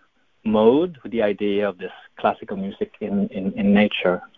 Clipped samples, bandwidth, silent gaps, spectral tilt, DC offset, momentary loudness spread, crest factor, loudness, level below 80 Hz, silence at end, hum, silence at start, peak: under 0.1%; 4 kHz; none; -9.5 dB/octave; under 0.1%; 12 LU; 18 dB; -21 LUFS; -54 dBFS; 0.1 s; none; 0.45 s; -2 dBFS